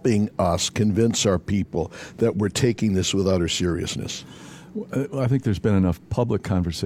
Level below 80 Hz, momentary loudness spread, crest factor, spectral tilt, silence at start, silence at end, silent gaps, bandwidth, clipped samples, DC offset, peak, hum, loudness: -44 dBFS; 11 LU; 16 dB; -5.5 dB/octave; 0.05 s; 0 s; none; 15.5 kHz; under 0.1%; under 0.1%; -6 dBFS; none; -23 LUFS